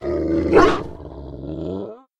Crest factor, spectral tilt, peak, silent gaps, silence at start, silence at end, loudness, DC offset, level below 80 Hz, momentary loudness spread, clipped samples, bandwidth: 20 dB; -6.5 dB/octave; 0 dBFS; none; 0 s; 0.2 s; -19 LUFS; under 0.1%; -38 dBFS; 20 LU; under 0.1%; 11 kHz